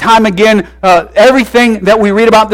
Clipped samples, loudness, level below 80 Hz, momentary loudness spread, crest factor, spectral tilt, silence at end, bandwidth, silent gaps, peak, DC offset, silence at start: 0.3%; -7 LUFS; -36 dBFS; 3 LU; 6 dB; -5 dB/octave; 0 s; 16.5 kHz; none; 0 dBFS; under 0.1%; 0 s